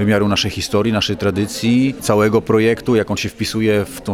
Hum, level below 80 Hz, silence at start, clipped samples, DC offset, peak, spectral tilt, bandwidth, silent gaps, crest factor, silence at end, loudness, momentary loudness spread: none; -42 dBFS; 0 s; under 0.1%; under 0.1%; -2 dBFS; -5.5 dB/octave; 16 kHz; none; 14 dB; 0 s; -17 LUFS; 5 LU